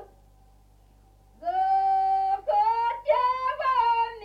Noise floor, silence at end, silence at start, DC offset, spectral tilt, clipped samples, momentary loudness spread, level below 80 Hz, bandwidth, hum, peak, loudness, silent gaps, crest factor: -56 dBFS; 0 s; 0 s; under 0.1%; -4 dB/octave; under 0.1%; 4 LU; -58 dBFS; 6.4 kHz; 50 Hz at -55 dBFS; -12 dBFS; -25 LUFS; none; 14 dB